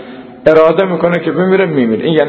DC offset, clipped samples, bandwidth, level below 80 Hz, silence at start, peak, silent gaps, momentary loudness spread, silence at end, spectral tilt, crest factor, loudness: under 0.1%; 0.6%; 6 kHz; -50 dBFS; 0 s; 0 dBFS; none; 5 LU; 0 s; -8.5 dB/octave; 12 dB; -11 LUFS